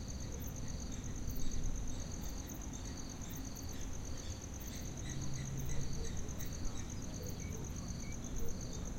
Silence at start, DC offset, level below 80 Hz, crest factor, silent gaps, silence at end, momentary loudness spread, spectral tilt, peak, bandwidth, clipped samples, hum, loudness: 0 s; under 0.1%; -44 dBFS; 14 dB; none; 0 s; 3 LU; -4.5 dB/octave; -26 dBFS; 16.5 kHz; under 0.1%; none; -44 LUFS